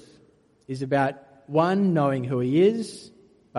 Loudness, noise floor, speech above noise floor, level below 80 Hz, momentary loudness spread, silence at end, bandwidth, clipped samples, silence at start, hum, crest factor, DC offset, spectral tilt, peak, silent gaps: -23 LUFS; -59 dBFS; 36 dB; -66 dBFS; 15 LU; 0 s; 11.5 kHz; under 0.1%; 0.7 s; none; 18 dB; under 0.1%; -7.5 dB/octave; -6 dBFS; none